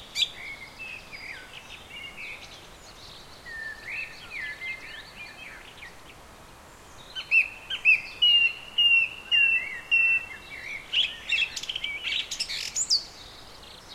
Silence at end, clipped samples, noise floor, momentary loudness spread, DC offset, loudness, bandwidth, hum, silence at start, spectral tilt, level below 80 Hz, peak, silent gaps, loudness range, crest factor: 0 s; under 0.1%; -49 dBFS; 24 LU; under 0.1%; -23 LUFS; 16 kHz; none; 0 s; 1 dB/octave; -58 dBFS; -10 dBFS; none; 18 LU; 18 dB